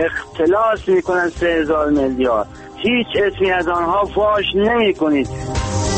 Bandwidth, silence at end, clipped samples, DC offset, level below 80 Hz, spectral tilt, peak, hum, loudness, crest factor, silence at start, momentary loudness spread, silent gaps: 8.8 kHz; 0 s; under 0.1%; under 0.1%; -36 dBFS; -5 dB/octave; -6 dBFS; none; -17 LUFS; 12 dB; 0 s; 6 LU; none